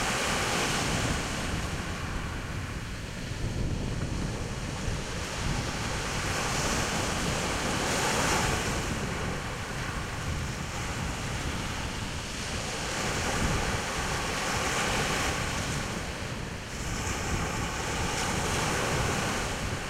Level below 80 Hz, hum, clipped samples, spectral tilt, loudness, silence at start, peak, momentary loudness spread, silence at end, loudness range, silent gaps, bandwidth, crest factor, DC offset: -40 dBFS; none; under 0.1%; -3.5 dB/octave; -30 LUFS; 0 s; -14 dBFS; 7 LU; 0 s; 5 LU; none; 16 kHz; 16 dB; under 0.1%